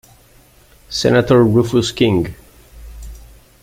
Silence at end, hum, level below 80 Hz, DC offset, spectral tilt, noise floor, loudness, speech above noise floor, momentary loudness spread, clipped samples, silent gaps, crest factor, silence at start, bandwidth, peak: 0.45 s; none; -40 dBFS; under 0.1%; -6 dB/octave; -48 dBFS; -15 LUFS; 35 dB; 25 LU; under 0.1%; none; 16 dB; 0.9 s; 16 kHz; 0 dBFS